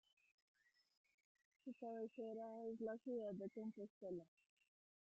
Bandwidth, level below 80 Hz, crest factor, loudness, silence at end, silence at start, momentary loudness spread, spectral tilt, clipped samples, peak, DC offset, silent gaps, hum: 8 kHz; under -90 dBFS; 16 dB; -52 LUFS; 0.8 s; 1.65 s; 7 LU; -7.5 dB/octave; under 0.1%; -38 dBFS; under 0.1%; 3.90-4.01 s; none